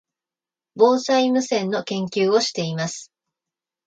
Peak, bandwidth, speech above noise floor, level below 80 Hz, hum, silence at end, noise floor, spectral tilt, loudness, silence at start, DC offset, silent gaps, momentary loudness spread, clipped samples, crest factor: -2 dBFS; 9.2 kHz; over 70 dB; -70 dBFS; none; 0.85 s; under -90 dBFS; -4.5 dB/octave; -20 LUFS; 0.75 s; under 0.1%; none; 9 LU; under 0.1%; 20 dB